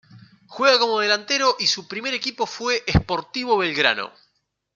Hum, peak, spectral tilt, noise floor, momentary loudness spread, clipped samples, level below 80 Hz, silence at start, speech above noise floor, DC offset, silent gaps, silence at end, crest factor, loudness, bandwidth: 50 Hz at -60 dBFS; -2 dBFS; -3.5 dB/octave; -48 dBFS; 9 LU; under 0.1%; -40 dBFS; 0.15 s; 27 dB; under 0.1%; none; 0.65 s; 22 dB; -20 LUFS; 7.6 kHz